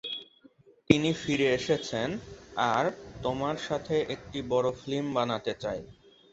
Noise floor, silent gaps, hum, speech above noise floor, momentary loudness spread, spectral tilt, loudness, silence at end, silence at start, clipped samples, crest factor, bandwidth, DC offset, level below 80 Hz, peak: -59 dBFS; none; none; 30 dB; 11 LU; -5.5 dB/octave; -30 LUFS; 0.4 s; 0.05 s; under 0.1%; 28 dB; 8.2 kHz; under 0.1%; -56 dBFS; -2 dBFS